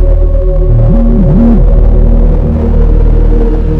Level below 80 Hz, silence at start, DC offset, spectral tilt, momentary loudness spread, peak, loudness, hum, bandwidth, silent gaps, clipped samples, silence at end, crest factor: -6 dBFS; 0 s; under 0.1%; -11.5 dB/octave; 4 LU; 0 dBFS; -9 LUFS; none; 2.5 kHz; none; 2%; 0 s; 4 dB